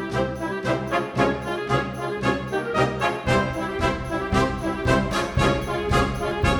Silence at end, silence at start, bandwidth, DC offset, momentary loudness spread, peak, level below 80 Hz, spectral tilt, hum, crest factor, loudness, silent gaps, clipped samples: 0 s; 0 s; 18 kHz; under 0.1%; 4 LU; -4 dBFS; -36 dBFS; -6 dB/octave; none; 18 dB; -24 LUFS; none; under 0.1%